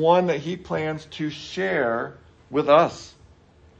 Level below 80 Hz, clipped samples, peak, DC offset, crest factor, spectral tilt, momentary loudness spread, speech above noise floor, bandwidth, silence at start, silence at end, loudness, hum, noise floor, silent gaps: -58 dBFS; under 0.1%; -2 dBFS; under 0.1%; 20 dB; -6 dB/octave; 13 LU; 31 dB; 8.4 kHz; 0 s; 0.7 s; -23 LUFS; none; -53 dBFS; none